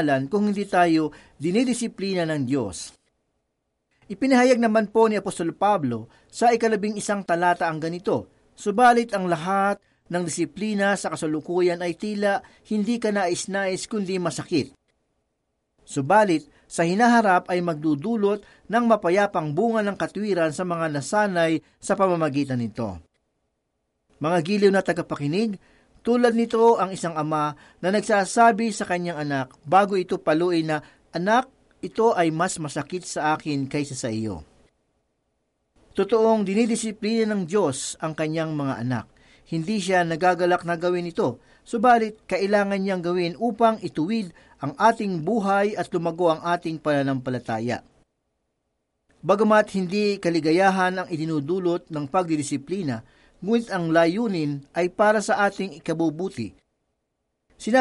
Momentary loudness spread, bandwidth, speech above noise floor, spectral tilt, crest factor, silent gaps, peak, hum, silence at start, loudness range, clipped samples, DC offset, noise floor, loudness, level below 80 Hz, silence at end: 11 LU; 11.5 kHz; 55 dB; -5.5 dB/octave; 18 dB; none; -6 dBFS; none; 0 s; 4 LU; under 0.1%; under 0.1%; -77 dBFS; -23 LUFS; -62 dBFS; 0 s